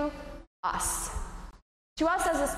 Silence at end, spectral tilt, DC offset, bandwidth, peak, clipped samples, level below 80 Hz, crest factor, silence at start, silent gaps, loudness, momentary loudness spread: 0 s; -3 dB/octave; under 0.1%; 15.5 kHz; -16 dBFS; under 0.1%; -44 dBFS; 16 dB; 0 s; 0.47-0.63 s, 1.62-1.96 s; -30 LUFS; 19 LU